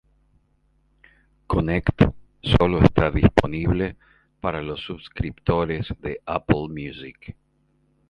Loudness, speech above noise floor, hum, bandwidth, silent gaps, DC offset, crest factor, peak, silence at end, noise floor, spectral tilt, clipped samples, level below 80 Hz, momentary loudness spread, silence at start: -23 LUFS; 43 dB; none; 11 kHz; none; under 0.1%; 22 dB; 0 dBFS; 0.8 s; -65 dBFS; -8.5 dB/octave; under 0.1%; -34 dBFS; 16 LU; 1.5 s